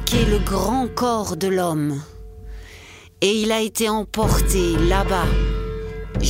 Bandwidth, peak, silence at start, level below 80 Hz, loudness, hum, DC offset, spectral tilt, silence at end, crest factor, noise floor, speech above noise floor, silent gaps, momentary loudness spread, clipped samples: 16 kHz; 0 dBFS; 0 s; -26 dBFS; -21 LUFS; none; under 0.1%; -5 dB/octave; 0 s; 20 dB; -43 dBFS; 24 dB; none; 21 LU; under 0.1%